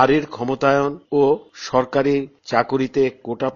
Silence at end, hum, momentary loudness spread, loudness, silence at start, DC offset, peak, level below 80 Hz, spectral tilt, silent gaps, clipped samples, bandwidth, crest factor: 0 s; none; 6 LU; -20 LUFS; 0 s; under 0.1%; 0 dBFS; -52 dBFS; -5 dB/octave; none; under 0.1%; 7.2 kHz; 18 dB